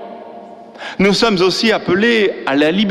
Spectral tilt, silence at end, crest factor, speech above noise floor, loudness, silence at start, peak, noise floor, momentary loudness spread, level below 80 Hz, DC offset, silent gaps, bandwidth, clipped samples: -5 dB/octave; 0 s; 12 dB; 21 dB; -14 LUFS; 0 s; -2 dBFS; -35 dBFS; 19 LU; -48 dBFS; under 0.1%; none; 13.5 kHz; under 0.1%